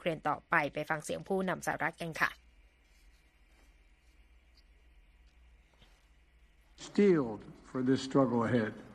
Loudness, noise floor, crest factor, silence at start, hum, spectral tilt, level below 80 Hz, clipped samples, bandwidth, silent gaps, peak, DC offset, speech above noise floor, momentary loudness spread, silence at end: -32 LUFS; -64 dBFS; 22 dB; 0 s; none; -6 dB/octave; -64 dBFS; under 0.1%; 14 kHz; none; -12 dBFS; under 0.1%; 32 dB; 11 LU; 0 s